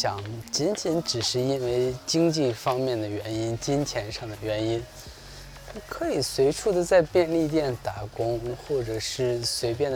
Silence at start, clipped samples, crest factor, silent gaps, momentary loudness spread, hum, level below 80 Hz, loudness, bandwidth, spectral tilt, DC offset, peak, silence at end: 0 s; under 0.1%; 18 dB; none; 12 LU; none; -50 dBFS; -26 LUFS; over 20 kHz; -4.5 dB/octave; under 0.1%; -8 dBFS; 0 s